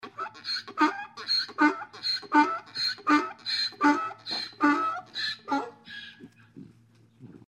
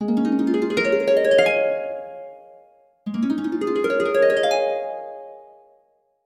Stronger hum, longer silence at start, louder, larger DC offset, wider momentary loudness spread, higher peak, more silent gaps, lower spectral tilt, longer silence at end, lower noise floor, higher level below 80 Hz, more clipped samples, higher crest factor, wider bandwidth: neither; about the same, 0.05 s vs 0 s; second, -27 LUFS vs -20 LUFS; neither; second, 13 LU vs 20 LU; second, -8 dBFS vs -4 dBFS; neither; second, -2.5 dB/octave vs -5 dB/octave; second, 0.15 s vs 0.8 s; second, -59 dBFS vs -63 dBFS; second, -78 dBFS vs -66 dBFS; neither; about the same, 22 dB vs 18 dB; second, 11 kHz vs 13 kHz